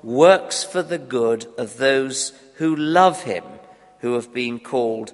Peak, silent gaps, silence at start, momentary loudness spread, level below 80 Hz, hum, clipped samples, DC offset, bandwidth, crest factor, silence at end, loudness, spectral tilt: 0 dBFS; none; 0.05 s; 13 LU; -66 dBFS; none; under 0.1%; under 0.1%; 11.5 kHz; 20 dB; 0.05 s; -20 LUFS; -4 dB/octave